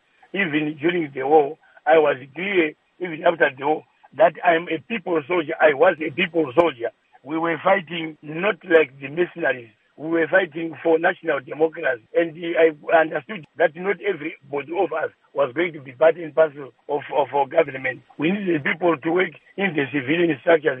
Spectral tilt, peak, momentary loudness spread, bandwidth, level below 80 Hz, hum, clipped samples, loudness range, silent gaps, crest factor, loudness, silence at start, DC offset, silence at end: -8.5 dB/octave; -2 dBFS; 10 LU; 3.8 kHz; -72 dBFS; none; under 0.1%; 3 LU; none; 20 dB; -21 LUFS; 0.35 s; under 0.1%; 0 s